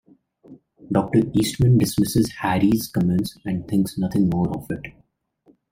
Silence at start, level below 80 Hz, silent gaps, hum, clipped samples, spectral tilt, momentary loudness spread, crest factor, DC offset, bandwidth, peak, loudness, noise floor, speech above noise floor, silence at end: 0.5 s; -46 dBFS; none; none; under 0.1%; -6.5 dB/octave; 11 LU; 18 dB; under 0.1%; 16 kHz; -4 dBFS; -21 LUFS; -60 dBFS; 39 dB; 0.8 s